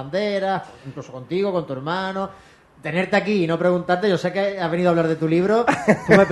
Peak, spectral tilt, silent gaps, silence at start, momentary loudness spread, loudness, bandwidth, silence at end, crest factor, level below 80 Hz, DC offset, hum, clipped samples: 0 dBFS; -6.5 dB/octave; none; 0 s; 12 LU; -21 LUFS; 12 kHz; 0 s; 20 dB; -56 dBFS; under 0.1%; none; under 0.1%